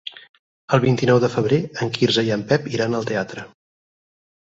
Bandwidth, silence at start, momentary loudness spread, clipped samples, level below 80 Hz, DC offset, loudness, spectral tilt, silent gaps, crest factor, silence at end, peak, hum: 7.8 kHz; 0.05 s; 9 LU; under 0.1%; -56 dBFS; under 0.1%; -20 LUFS; -6 dB/octave; 0.29-0.68 s; 18 dB; 1.05 s; -2 dBFS; none